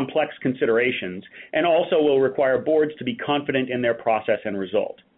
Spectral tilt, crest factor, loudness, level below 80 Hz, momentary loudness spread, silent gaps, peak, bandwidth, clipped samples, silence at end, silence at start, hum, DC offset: -10 dB/octave; 16 dB; -22 LUFS; -64 dBFS; 7 LU; none; -6 dBFS; 4.1 kHz; under 0.1%; 0.25 s; 0 s; none; under 0.1%